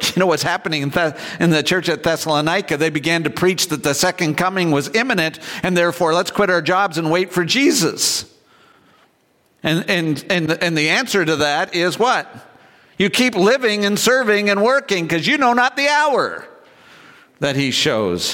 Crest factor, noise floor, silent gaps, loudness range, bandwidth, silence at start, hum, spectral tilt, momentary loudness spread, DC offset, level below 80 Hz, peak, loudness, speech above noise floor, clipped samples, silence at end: 14 dB; -59 dBFS; none; 3 LU; 17 kHz; 0 s; none; -3.5 dB/octave; 5 LU; under 0.1%; -56 dBFS; -4 dBFS; -17 LUFS; 42 dB; under 0.1%; 0 s